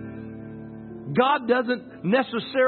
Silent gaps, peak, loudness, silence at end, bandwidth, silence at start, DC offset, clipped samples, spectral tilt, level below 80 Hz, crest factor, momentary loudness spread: none; -6 dBFS; -24 LUFS; 0 s; 4.4 kHz; 0 s; under 0.1%; under 0.1%; -10.5 dB/octave; -62 dBFS; 18 dB; 18 LU